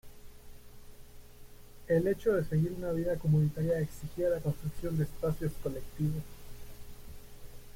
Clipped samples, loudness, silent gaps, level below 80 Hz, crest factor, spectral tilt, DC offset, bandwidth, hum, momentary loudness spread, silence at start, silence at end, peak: under 0.1%; -32 LUFS; none; -48 dBFS; 16 dB; -8 dB/octave; under 0.1%; 16.5 kHz; 60 Hz at -55 dBFS; 23 LU; 0.05 s; 0.05 s; -18 dBFS